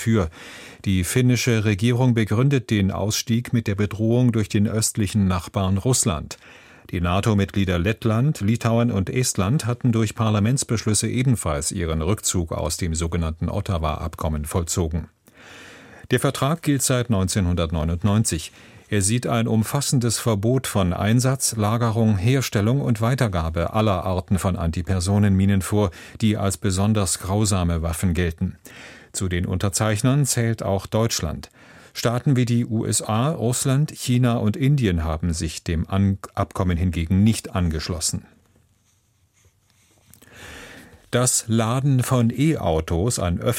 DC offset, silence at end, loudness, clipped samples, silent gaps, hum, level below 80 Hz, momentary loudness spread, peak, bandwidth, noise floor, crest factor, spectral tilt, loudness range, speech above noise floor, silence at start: under 0.1%; 0 s; -22 LUFS; under 0.1%; none; none; -38 dBFS; 7 LU; -4 dBFS; 16.5 kHz; -63 dBFS; 16 dB; -5.5 dB/octave; 4 LU; 42 dB; 0 s